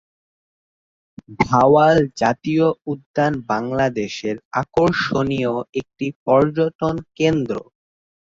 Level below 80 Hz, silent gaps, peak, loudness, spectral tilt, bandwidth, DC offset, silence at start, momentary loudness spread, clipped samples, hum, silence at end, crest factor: -50 dBFS; 3.06-3.14 s, 4.45-4.51 s, 5.69-5.73 s, 6.16-6.26 s, 6.75-6.79 s; -2 dBFS; -19 LUFS; -6.5 dB/octave; 7.6 kHz; under 0.1%; 1.3 s; 12 LU; under 0.1%; none; 0.75 s; 18 dB